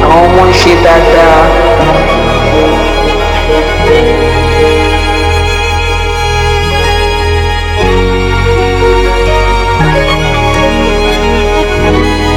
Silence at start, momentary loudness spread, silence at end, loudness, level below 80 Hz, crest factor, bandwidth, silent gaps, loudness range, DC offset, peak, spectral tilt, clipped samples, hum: 0 s; 6 LU; 0 s; -8 LUFS; -14 dBFS; 8 dB; 15 kHz; none; 3 LU; under 0.1%; 0 dBFS; -5.5 dB/octave; 4%; none